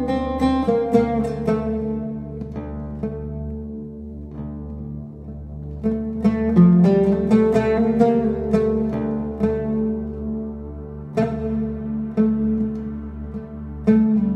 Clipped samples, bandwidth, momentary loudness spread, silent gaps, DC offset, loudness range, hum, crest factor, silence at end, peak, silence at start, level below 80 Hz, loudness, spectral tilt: under 0.1%; 8.6 kHz; 17 LU; none; under 0.1%; 12 LU; none; 18 dB; 0 s; -2 dBFS; 0 s; -36 dBFS; -21 LUFS; -9.5 dB/octave